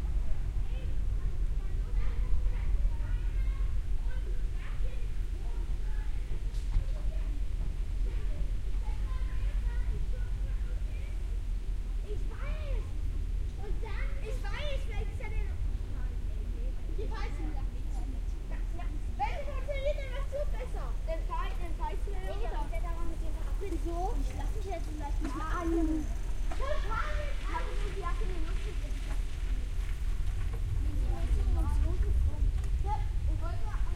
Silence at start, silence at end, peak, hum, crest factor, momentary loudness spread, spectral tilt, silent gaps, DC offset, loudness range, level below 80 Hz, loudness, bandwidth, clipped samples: 0 s; 0 s; -16 dBFS; none; 16 dB; 6 LU; -6.5 dB/octave; none; under 0.1%; 4 LU; -32 dBFS; -37 LUFS; 10.5 kHz; under 0.1%